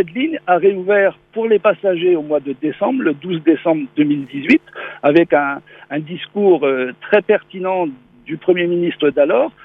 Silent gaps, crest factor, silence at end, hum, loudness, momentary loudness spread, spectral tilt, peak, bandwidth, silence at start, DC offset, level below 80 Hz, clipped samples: none; 16 dB; 0.15 s; none; -16 LUFS; 9 LU; -8.5 dB/octave; 0 dBFS; 5.6 kHz; 0 s; under 0.1%; -62 dBFS; under 0.1%